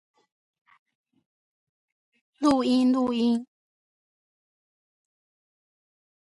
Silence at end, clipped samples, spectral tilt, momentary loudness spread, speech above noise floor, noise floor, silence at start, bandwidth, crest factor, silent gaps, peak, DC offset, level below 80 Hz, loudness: 2.85 s; under 0.1%; -5 dB/octave; 5 LU; over 68 dB; under -90 dBFS; 2.4 s; 11.5 kHz; 22 dB; none; -8 dBFS; under 0.1%; -70 dBFS; -24 LUFS